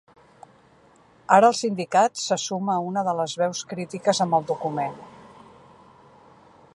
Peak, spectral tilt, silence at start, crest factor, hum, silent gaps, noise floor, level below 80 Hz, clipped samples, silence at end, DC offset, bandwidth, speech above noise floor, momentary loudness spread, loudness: -2 dBFS; -4 dB/octave; 1.3 s; 22 dB; none; none; -56 dBFS; -72 dBFS; under 0.1%; 1.6 s; under 0.1%; 11.5 kHz; 33 dB; 14 LU; -23 LUFS